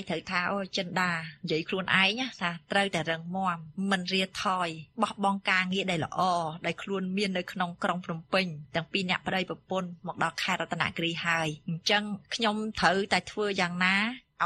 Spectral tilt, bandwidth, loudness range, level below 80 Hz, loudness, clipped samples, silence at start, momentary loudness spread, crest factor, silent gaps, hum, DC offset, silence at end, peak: -4.5 dB/octave; 12.5 kHz; 3 LU; -64 dBFS; -29 LUFS; under 0.1%; 0 s; 8 LU; 22 dB; none; none; under 0.1%; 0 s; -8 dBFS